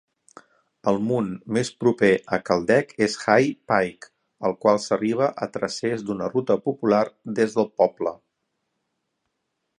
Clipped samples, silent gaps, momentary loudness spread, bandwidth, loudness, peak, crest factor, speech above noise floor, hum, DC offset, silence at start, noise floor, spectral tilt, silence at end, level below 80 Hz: under 0.1%; none; 8 LU; 11.5 kHz; -23 LUFS; -2 dBFS; 22 dB; 55 dB; none; under 0.1%; 0.85 s; -78 dBFS; -5.5 dB/octave; 1.65 s; -62 dBFS